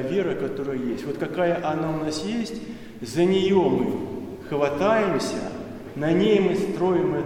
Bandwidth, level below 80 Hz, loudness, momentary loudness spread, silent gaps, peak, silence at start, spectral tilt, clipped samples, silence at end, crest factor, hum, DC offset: 15.5 kHz; -52 dBFS; -24 LUFS; 14 LU; none; -8 dBFS; 0 s; -6 dB/octave; under 0.1%; 0 s; 16 dB; none; under 0.1%